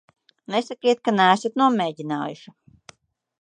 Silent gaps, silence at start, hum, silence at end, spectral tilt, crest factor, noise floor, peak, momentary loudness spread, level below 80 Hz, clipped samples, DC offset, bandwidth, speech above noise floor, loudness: none; 0.5 s; none; 1.05 s; -5 dB/octave; 22 dB; -52 dBFS; -2 dBFS; 11 LU; -74 dBFS; under 0.1%; under 0.1%; 10 kHz; 31 dB; -22 LUFS